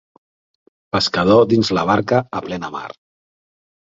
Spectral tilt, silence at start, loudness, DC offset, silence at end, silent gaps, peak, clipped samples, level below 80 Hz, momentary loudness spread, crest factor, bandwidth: -5.5 dB/octave; 0.95 s; -17 LUFS; under 0.1%; 0.95 s; none; -2 dBFS; under 0.1%; -50 dBFS; 15 LU; 18 dB; 7.8 kHz